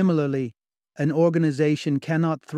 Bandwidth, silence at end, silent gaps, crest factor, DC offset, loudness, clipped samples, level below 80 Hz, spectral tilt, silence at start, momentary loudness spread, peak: 10 kHz; 0 s; none; 14 dB; under 0.1%; -23 LUFS; under 0.1%; -68 dBFS; -8 dB/octave; 0 s; 7 LU; -8 dBFS